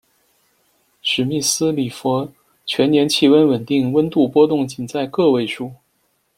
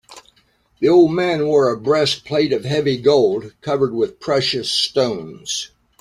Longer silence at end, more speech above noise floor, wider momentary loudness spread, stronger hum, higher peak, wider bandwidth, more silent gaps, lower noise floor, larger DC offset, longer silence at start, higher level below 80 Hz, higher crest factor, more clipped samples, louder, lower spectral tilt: first, 0.65 s vs 0.35 s; first, 49 dB vs 42 dB; about the same, 11 LU vs 10 LU; neither; about the same, -2 dBFS vs -2 dBFS; first, 16.5 kHz vs 13.5 kHz; neither; first, -65 dBFS vs -59 dBFS; neither; first, 1.05 s vs 0.1 s; about the same, -58 dBFS vs -56 dBFS; about the same, 16 dB vs 16 dB; neither; about the same, -17 LUFS vs -18 LUFS; about the same, -4.5 dB/octave vs -4.5 dB/octave